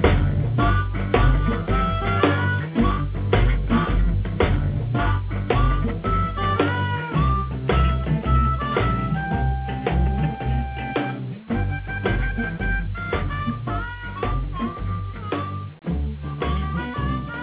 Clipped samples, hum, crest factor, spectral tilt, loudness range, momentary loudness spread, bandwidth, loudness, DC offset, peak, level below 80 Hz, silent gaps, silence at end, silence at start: under 0.1%; none; 18 dB; -11 dB/octave; 6 LU; 8 LU; 4 kHz; -23 LUFS; under 0.1%; -4 dBFS; -26 dBFS; none; 0 s; 0 s